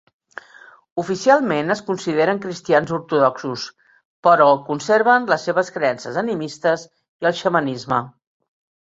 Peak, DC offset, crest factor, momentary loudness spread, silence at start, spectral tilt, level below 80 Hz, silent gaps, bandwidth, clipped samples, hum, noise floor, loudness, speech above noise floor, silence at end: -2 dBFS; under 0.1%; 18 dB; 14 LU; 0.95 s; -5 dB/octave; -64 dBFS; 4.05-4.23 s, 7.09-7.19 s; 8 kHz; under 0.1%; none; -47 dBFS; -19 LUFS; 28 dB; 0.75 s